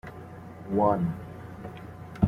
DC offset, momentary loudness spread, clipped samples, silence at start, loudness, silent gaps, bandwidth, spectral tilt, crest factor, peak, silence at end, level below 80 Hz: under 0.1%; 19 LU; under 0.1%; 0.05 s; -27 LUFS; none; 14 kHz; -10 dB/octave; 22 dB; -8 dBFS; 0 s; -52 dBFS